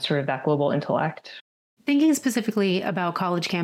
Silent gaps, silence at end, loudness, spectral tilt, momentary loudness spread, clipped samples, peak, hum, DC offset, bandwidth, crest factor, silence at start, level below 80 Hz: 1.41-1.77 s; 0 s; -24 LUFS; -5.5 dB/octave; 12 LU; under 0.1%; -12 dBFS; none; under 0.1%; 16.5 kHz; 12 dB; 0 s; -78 dBFS